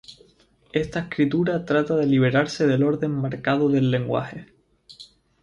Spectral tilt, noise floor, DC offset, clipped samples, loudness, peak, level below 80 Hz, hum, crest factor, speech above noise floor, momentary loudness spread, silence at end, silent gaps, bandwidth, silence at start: -7.5 dB/octave; -58 dBFS; under 0.1%; under 0.1%; -22 LUFS; -6 dBFS; -56 dBFS; none; 16 dB; 37 dB; 8 LU; 0.35 s; none; 10 kHz; 0.1 s